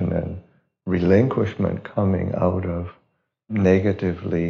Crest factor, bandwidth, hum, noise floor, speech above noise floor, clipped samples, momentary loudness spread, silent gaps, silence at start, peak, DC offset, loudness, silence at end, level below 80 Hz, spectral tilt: 18 dB; 6.6 kHz; none; -68 dBFS; 48 dB; under 0.1%; 14 LU; none; 0 s; -4 dBFS; under 0.1%; -22 LUFS; 0 s; -46 dBFS; -8.5 dB/octave